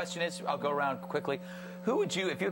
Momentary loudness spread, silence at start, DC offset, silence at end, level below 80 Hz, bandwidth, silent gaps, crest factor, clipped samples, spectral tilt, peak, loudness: 7 LU; 0 s; under 0.1%; 0 s; -74 dBFS; 17 kHz; none; 16 dB; under 0.1%; -4.5 dB/octave; -18 dBFS; -33 LUFS